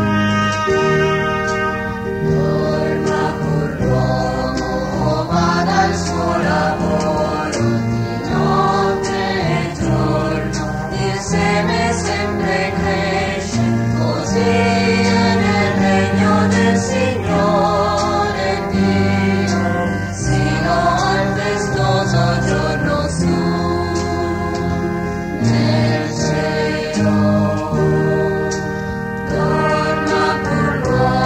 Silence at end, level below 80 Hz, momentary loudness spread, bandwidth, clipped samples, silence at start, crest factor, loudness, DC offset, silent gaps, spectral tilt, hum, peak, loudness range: 0 s; -34 dBFS; 5 LU; 14 kHz; under 0.1%; 0 s; 14 dB; -17 LUFS; under 0.1%; none; -6 dB/octave; none; -4 dBFS; 3 LU